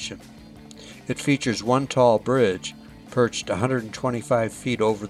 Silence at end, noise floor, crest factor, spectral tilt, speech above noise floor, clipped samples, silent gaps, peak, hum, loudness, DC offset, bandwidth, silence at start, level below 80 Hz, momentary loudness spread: 0 s; -43 dBFS; 18 dB; -5.5 dB/octave; 21 dB; under 0.1%; none; -6 dBFS; none; -23 LUFS; under 0.1%; 14.5 kHz; 0 s; -54 dBFS; 16 LU